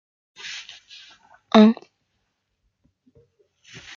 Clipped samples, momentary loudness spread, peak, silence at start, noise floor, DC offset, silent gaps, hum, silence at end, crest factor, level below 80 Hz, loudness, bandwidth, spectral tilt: under 0.1%; 27 LU; -2 dBFS; 0.45 s; -74 dBFS; under 0.1%; none; none; 2.25 s; 22 dB; -70 dBFS; -17 LUFS; 7.2 kHz; -6 dB/octave